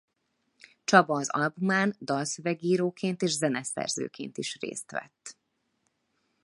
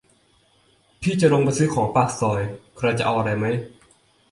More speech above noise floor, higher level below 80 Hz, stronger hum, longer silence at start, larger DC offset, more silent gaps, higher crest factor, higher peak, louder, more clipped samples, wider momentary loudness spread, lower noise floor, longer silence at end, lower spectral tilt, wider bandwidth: first, 49 dB vs 39 dB; second, -78 dBFS vs -52 dBFS; neither; about the same, 0.9 s vs 1 s; neither; neither; first, 26 dB vs 18 dB; about the same, -4 dBFS vs -4 dBFS; second, -28 LUFS vs -22 LUFS; neither; first, 15 LU vs 10 LU; first, -77 dBFS vs -60 dBFS; first, 1.1 s vs 0.65 s; second, -4 dB/octave vs -6 dB/octave; about the same, 11.5 kHz vs 11.5 kHz